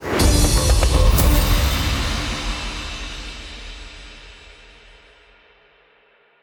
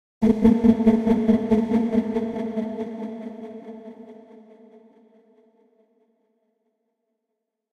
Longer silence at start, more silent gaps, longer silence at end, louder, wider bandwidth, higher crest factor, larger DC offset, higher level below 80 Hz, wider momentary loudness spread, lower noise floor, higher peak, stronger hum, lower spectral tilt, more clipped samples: second, 0 s vs 0.2 s; neither; second, 2.1 s vs 3.6 s; about the same, -19 LUFS vs -21 LUFS; first, over 20 kHz vs 6.4 kHz; second, 16 dB vs 22 dB; neither; first, -22 dBFS vs -50 dBFS; about the same, 22 LU vs 21 LU; second, -56 dBFS vs -81 dBFS; about the same, -4 dBFS vs -4 dBFS; neither; second, -4 dB/octave vs -9 dB/octave; neither